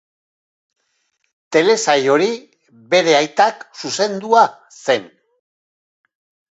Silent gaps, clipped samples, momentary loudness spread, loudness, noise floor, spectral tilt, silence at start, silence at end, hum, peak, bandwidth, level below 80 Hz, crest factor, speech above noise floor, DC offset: none; under 0.1%; 9 LU; -16 LUFS; -68 dBFS; -3 dB/octave; 1.5 s; 1.45 s; none; 0 dBFS; 8.2 kHz; -72 dBFS; 18 dB; 52 dB; under 0.1%